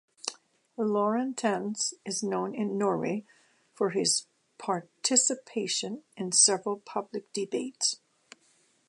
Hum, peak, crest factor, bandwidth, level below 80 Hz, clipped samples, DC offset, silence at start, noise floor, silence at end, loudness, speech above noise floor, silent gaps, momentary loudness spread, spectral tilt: none; -10 dBFS; 22 dB; 11.5 kHz; -84 dBFS; under 0.1%; under 0.1%; 0.25 s; -67 dBFS; 0.9 s; -28 LUFS; 38 dB; none; 14 LU; -2.5 dB/octave